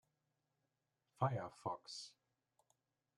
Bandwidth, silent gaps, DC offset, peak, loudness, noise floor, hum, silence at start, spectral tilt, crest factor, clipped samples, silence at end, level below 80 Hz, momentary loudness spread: 11 kHz; none; under 0.1%; -24 dBFS; -45 LUFS; -88 dBFS; none; 1.2 s; -5.5 dB/octave; 26 dB; under 0.1%; 1.05 s; -86 dBFS; 11 LU